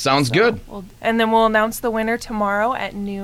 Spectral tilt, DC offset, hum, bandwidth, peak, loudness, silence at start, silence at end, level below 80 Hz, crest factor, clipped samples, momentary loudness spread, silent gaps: -4.5 dB/octave; under 0.1%; none; 16 kHz; -4 dBFS; -19 LUFS; 0 s; 0 s; -44 dBFS; 16 dB; under 0.1%; 10 LU; none